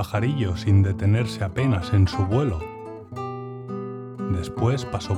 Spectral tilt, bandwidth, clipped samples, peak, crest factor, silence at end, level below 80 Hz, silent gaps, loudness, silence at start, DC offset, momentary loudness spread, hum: -7.5 dB/octave; 12 kHz; under 0.1%; -8 dBFS; 16 dB; 0 s; -46 dBFS; none; -24 LUFS; 0 s; under 0.1%; 14 LU; none